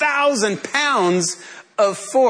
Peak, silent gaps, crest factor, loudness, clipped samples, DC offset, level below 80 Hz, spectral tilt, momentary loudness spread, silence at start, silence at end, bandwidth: -6 dBFS; none; 12 dB; -18 LUFS; under 0.1%; under 0.1%; -74 dBFS; -3 dB/octave; 8 LU; 0 s; 0 s; 11 kHz